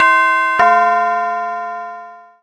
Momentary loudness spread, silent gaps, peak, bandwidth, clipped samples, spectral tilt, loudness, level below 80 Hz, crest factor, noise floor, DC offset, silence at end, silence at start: 17 LU; none; 0 dBFS; 10 kHz; under 0.1%; -2.5 dB/octave; -14 LUFS; -60 dBFS; 14 dB; -35 dBFS; under 0.1%; 0.25 s; 0 s